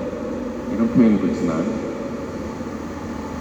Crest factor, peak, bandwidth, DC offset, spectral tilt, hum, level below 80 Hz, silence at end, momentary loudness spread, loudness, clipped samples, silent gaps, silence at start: 18 dB; -4 dBFS; 8.4 kHz; under 0.1%; -7.5 dB/octave; none; -44 dBFS; 0 s; 13 LU; -22 LUFS; under 0.1%; none; 0 s